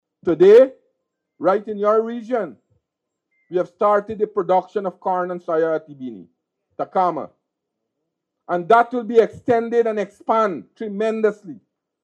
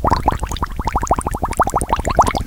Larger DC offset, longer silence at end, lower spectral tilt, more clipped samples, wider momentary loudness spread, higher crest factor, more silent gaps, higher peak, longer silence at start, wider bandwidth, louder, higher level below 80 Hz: neither; first, 0.5 s vs 0 s; first, -7 dB/octave vs -5 dB/octave; neither; first, 15 LU vs 7 LU; about the same, 18 dB vs 18 dB; neither; about the same, -2 dBFS vs 0 dBFS; first, 0.25 s vs 0 s; second, 8.4 kHz vs 18.5 kHz; about the same, -19 LUFS vs -19 LUFS; second, -66 dBFS vs -24 dBFS